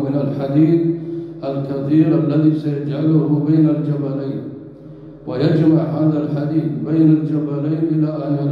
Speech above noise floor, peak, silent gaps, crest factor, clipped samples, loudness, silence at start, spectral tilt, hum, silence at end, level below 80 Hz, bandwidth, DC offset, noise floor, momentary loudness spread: 20 dB; -4 dBFS; none; 14 dB; under 0.1%; -17 LUFS; 0 s; -11 dB/octave; none; 0 s; -54 dBFS; 5 kHz; under 0.1%; -37 dBFS; 13 LU